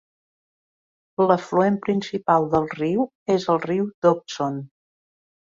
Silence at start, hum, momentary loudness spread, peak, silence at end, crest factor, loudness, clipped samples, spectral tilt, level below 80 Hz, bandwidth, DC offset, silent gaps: 1.2 s; none; 8 LU; -4 dBFS; 0.9 s; 20 dB; -22 LUFS; under 0.1%; -7 dB/octave; -60 dBFS; 7.6 kHz; under 0.1%; 3.15-3.26 s, 3.94-4.02 s